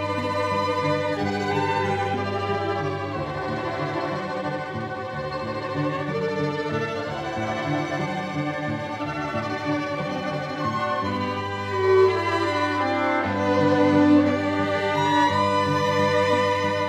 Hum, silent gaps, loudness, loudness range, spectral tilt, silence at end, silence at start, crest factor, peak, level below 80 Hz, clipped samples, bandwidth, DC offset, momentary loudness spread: none; none; -24 LUFS; 7 LU; -6 dB/octave; 0 s; 0 s; 16 dB; -8 dBFS; -56 dBFS; under 0.1%; 12.5 kHz; under 0.1%; 9 LU